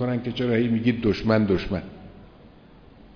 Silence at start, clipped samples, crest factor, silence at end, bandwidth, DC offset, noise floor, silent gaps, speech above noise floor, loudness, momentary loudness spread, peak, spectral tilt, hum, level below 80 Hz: 0 s; under 0.1%; 16 dB; 0.7 s; 5.4 kHz; under 0.1%; -49 dBFS; none; 27 dB; -23 LUFS; 11 LU; -10 dBFS; -8.5 dB/octave; none; -44 dBFS